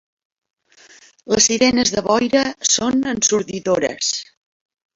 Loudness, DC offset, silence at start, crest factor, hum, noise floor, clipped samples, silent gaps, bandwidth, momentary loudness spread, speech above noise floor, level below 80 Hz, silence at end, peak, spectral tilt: -17 LUFS; under 0.1%; 1.25 s; 18 dB; none; -48 dBFS; under 0.1%; none; 8 kHz; 7 LU; 31 dB; -52 dBFS; 0.7 s; -2 dBFS; -2 dB/octave